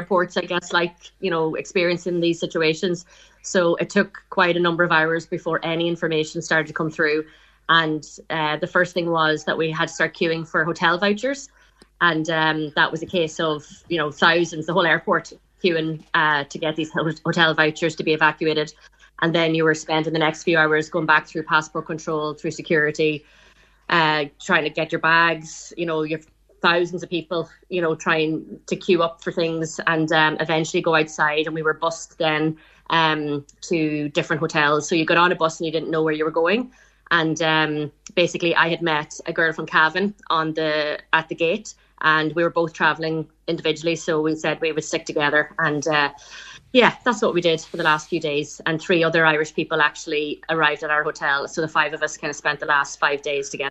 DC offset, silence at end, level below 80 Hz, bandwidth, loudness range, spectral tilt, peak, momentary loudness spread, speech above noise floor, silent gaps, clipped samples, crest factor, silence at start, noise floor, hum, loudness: under 0.1%; 0 s; -60 dBFS; 8.4 kHz; 2 LU; -4.5 dB/octave; 0 dBFS; 8 LU; 19 dB; none; under 0.1%; 22 dB; 0 s; -40 dBFS; none; -21 LUFS